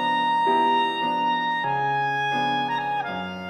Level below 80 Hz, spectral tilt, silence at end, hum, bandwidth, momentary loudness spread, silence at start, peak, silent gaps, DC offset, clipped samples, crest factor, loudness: -68 dBFS; -5 dB/octave; 0 s; none; 12 kHz; 6 LU; 0 s; -10 dBFS; none; under 0.1%; under 0.1%; 14 dB; -23 LUFS